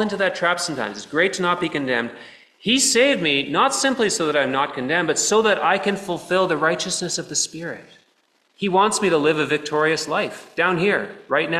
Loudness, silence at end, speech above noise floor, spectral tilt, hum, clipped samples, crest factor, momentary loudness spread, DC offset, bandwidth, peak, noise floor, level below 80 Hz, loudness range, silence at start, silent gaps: -20 LUFS; 0 s; 43 dB; -2.5 dB/octave; none; under 0.1%; 16 dB; 8 LU; under 0.1%; 14 kHz; -4 dBFS; -63 dBFS; -62 dBFS; 3 LU; 0 s; none